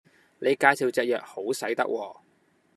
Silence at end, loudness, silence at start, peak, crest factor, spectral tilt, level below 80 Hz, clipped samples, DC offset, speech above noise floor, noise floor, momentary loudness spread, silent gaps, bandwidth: 0.65 s; -26 LUFS; 0.4 s; -2 dBFS; 24 dB; -3.5 dB/octave; -80 dBFS; under 0.1%; under 0.1%; 40 dB; -66 dBFS; 11 LU; none; 14 kHz